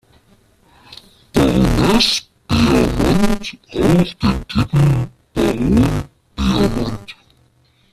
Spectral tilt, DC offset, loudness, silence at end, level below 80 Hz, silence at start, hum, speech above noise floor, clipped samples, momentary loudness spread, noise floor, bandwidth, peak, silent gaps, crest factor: -6 dB/octave; under 0.1%; -16 LUFS; 0.8 s; -28 dBFS; 0.9 s; none; 40 dB; under 0.1%; 11 LU; -56 dBFS; 14.5 kHz; -2 dBFS; none; 16 dB